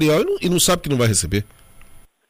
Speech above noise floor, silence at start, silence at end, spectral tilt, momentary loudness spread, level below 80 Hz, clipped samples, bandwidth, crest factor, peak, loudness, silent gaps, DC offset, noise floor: 26 dB; 0 s; 0.3 s; -4 dB/octave; 8 LU; -40 dBFS; under 0.1%; 15.5 kHz; 16 dB; -4 dBFS; -18 LUFS; none; under 0.1%; -44 dBFS